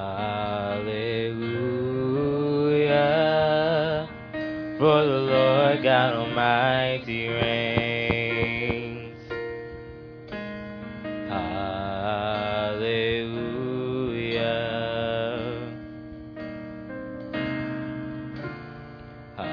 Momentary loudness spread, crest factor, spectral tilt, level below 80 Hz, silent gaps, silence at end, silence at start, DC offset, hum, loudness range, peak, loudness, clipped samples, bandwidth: 17 LU; 20 dB; -8 dB/octave; -52 dBFS; none; 0 s; 0 s; under 0.1%; none; 11 LU; -6 dBFS; -25 LUFS; under 0.1%; 5.4 kHz